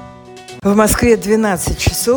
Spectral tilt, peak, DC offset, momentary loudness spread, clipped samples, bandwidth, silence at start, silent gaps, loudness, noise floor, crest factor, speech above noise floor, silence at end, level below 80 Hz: -4.5 dB/octave; 0 dBFS; under 0.1%; 7 LU; under 0.1%; 19 kHz; 0 s; none; -14 LUFS; -35 dBFS; 14 dB; 22 dB; 0 s; -28 dBFS